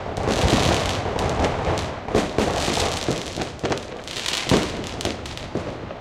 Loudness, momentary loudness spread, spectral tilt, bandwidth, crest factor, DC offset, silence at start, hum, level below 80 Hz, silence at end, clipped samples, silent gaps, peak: -23 LUFS; 10 LU; -4.5 dB/octave; 16.5 kHz; 20 dB; under 0.1%; 0 s; none; -36 dBFS; 0 s; under 0.1%; none; -4 dBFS